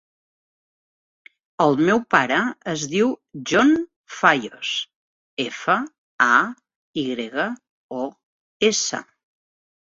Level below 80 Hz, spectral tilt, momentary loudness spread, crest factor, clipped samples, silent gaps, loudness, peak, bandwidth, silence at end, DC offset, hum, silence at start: -64 dBFS; -3.5 dB/octave; 15 LU; 22 dB; under 0.1%; 3.96-4.04 s, 4.96-5.37 s, 5.98-6.19 s, 6.76-6.94 s, 7.70-7.89 s, 8.23-8.60 s; -21 LUFS; -2 dBFS; 7.8 kHz; 0.95 s; under 0.1%; none; 1.6 s